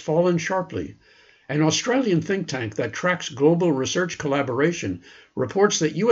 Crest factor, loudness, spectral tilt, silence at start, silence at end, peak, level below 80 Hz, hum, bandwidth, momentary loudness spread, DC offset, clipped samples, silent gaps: 18 dB; -23 LUFS; -5 dB/octave; 0 s; 0 s; -6 dBFS; -60 dBFS; none; 8 kHz; 11 LU; under 0.1%; under 0.1%; none